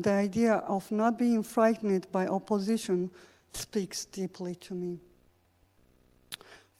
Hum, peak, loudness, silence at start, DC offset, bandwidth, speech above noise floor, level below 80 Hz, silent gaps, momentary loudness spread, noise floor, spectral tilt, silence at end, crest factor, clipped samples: none; -12 dBFS; -30 LUFS; 0 s; under 0.1%; 16 kHz; 38 dB; -64 dBFS; none; 16 LU; -67 dBFS; -5.5 dB/octave; 0.25 s; 20 dB; under 0.1%